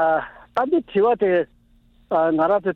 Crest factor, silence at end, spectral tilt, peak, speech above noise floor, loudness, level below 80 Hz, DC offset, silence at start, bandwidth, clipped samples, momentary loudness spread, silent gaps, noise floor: 14 dB; 0 s; -8.5 dB/octave; -6 dBFS; 36 dB; -21 LUFS; -56 dBFS; under 0.1%; 0 s; 5.2 kHz; under 0.1%; 7 LU; none; -56 dBFS